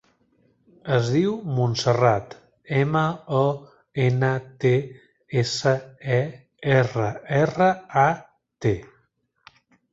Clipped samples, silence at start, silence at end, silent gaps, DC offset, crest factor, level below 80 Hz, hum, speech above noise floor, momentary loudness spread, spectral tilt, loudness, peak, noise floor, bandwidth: under 0.1%; 0.85 s; 1.05 s; none; under 0.1%; 20 dB; -56 dBFS; none; 46 dB; 11 LU; -6.5 dB/octave; -23 LUFS; -4 dBFS; -67 dBFS; 8 kHz